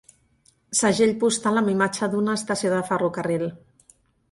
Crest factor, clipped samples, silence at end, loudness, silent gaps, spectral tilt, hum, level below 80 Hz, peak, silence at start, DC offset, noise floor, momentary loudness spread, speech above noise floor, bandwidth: 16 dB; under 0.1%; 0.75 s; -23 LUFS; none; -4 dB/octave; none; -62 dBFS; -8 dBFS; 0.7 s; under 0.1%; -62 dBFS; 6 LU; 40 dB; 11.5 kHz